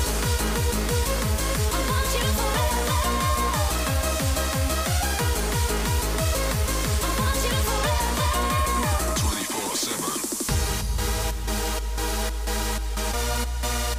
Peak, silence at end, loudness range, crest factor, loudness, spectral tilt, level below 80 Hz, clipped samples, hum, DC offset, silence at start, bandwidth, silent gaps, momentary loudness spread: -10 dBFS; 0 s; 3 LU; 14 dB; -24 LUFS; -3.5 dB/octave; -28 dBFS; under 0.1%; none; under 0.1%; 0 s; 16 kHz; none; 4 LU